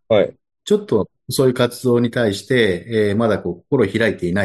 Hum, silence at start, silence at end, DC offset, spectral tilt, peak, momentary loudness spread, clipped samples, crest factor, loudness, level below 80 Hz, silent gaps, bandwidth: none; 0.1 s; 0 s; under 0.1%; -6 dB/octave; -2 dBFS; 4 LU; under 0.1%; 16 dB; -18 LUFS; -56 dBFS; none; 12.5 kHz